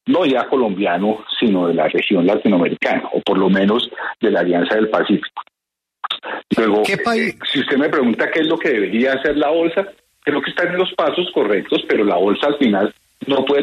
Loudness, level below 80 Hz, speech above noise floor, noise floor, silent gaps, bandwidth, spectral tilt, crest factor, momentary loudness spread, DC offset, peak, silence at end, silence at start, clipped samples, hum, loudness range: -17 LUFS; -58 dBFS; 66 dB; -82 dBFS; none; 12.5 kHz; -6 dB/octave; 14 dB; 6 LU; under 0.1%; -4 dBFS; 0 s; 0.05 s; under 0.1%; none; 2 LU